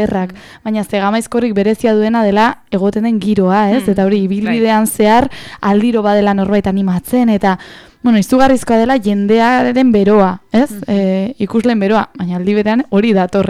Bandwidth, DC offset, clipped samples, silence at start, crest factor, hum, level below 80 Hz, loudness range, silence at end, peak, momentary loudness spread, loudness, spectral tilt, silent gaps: 15.5 kHz; under 0.1%; under 0.1%; 0 s; 10 dB; none; -42 dBFS; 2 LU; 0 s; -2 dBFS; 6 LU; -13 LUFS; -6.5 dB/octave; none